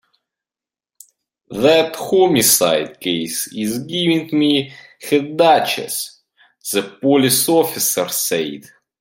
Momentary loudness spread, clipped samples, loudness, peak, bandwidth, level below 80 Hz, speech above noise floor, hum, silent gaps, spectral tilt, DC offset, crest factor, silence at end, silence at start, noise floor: 12 LU; under 0.1%; -16 LUFS; 0 dBFS; 17 kHz; -60 dBFS; over 74 dB; none; none; -3 dB/octave; under 0.1%; 18 dB; 0.4 s; 1.5 s; under -90 dBFS